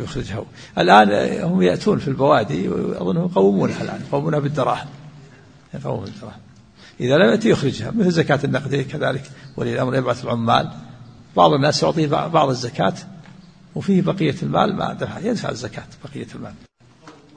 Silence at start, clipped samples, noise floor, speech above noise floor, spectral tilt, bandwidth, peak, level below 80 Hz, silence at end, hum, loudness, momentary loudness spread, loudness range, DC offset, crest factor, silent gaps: 0 s; under 0.1%; -46 dBFS; 28 dB; -6 dB/octave; 9.8 kHz; 0 dBFS; -50 dBFS; 0.25 s; none; -19 LUFS; 18 LU; 5 LU; under 0.1%; 20 dB; none